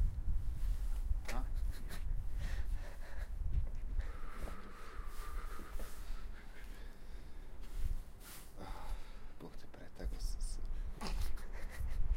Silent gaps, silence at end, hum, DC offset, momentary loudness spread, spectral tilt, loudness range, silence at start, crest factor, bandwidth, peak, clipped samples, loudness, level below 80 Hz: none; 0 s; none; under 0.1%; 12 LU; -5 dB/octave; 7 LU; 0 s; 14 dB; 15.5 kHz; -22 dBFS; under 0.1%; -47 LUFS; -40 dBFS